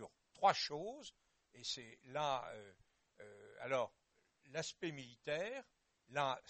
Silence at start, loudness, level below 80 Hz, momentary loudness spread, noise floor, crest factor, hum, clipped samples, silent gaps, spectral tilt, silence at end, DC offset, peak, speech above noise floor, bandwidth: 0 s; -42 LUFS; -80 dBFS; 22 LU; -74 dBFS; 24 dB; none; under 0.1%; none; -3 dB/octave; 0.1 s; under 0.1%; -20 dBFS; 32 dB; 8.4 kHz